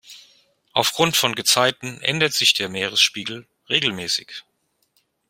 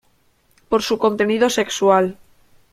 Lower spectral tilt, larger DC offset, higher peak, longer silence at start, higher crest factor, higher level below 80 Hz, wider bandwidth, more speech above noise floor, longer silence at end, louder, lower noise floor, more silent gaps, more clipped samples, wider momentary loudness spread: second, -1.5 dB/octave vs -4 dB/octave; neither; about the same, -2 dBFS vs -2 dBFS; second, 0.1 s vs 0.7 s; about the same, 22 dB vs 18 dB; second, -64 dBFS vs -54 dBFS; about the same, 16.5 kHz vs 15.5 kHz; first, 46 dB vs 42 dB; first, 0.9 s vs 0.6 s; about the same, -19 LUFS vs -18 LUFS; first, -67 dBFS vs -59 dBFS; neither; neither; first, 14 LU vs 6 LU